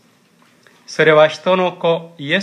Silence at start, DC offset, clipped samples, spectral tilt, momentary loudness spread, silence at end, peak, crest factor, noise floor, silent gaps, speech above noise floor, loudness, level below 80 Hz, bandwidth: 0.9 s; under 0.1%; under 0.1%; -5 dB/octave; 10 LU; 0 s; 0 dBFS; 16 dB; -53 dBFS; none; 39 dB; -15 LUFS; -74 dBFS; 10.5 kHz